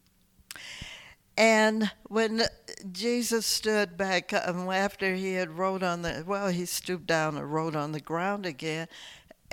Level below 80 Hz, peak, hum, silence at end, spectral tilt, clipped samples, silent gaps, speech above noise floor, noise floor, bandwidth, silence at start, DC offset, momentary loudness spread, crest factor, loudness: -58 dBFS; -10 dBFS; none; 0.35 s; -4 dB/octave; under 0.1%; none; 35 dB; -63 dBFS; 19 kHz; 0.5 s; under 0.1%; 16 LU; 20 dB; -28 LUFS